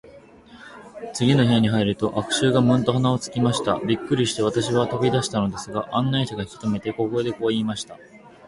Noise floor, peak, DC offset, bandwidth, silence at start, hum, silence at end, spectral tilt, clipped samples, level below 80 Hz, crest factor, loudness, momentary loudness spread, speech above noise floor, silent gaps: -47 dBFS; -4 dBFS; under 0.1%; 11.5 kHz; 0.05 s; none; 0.2 s; -5.5 dB/octave; under 0.1%; -52 dBFS; 18 dB; -22 LUFS; 10 LU; 25 dB; none